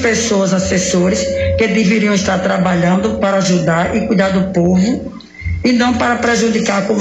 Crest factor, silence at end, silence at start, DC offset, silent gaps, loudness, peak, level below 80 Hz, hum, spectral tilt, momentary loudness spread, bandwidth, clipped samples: 12 dB; 0 s; 0 s; under 0.1%; none; -14 LUFS; -2 dBFS; -34 dBFS; none; -5 dB/octave; 3 LU; 8.6 kHz; under 0.1%